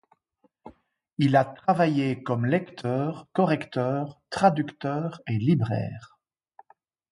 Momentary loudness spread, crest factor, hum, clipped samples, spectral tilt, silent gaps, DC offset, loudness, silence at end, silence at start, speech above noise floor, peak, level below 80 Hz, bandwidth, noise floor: 9 LU; 20 dB; none; under 0.1%; -8 dB/octave; 1.13-1.17 s; under 0.1%; -26 LUFS; 1.05 s; 0.65 s; 44 dB; -6 dBFS; -62 dBFS; 11.5 kHz; -69 dBFS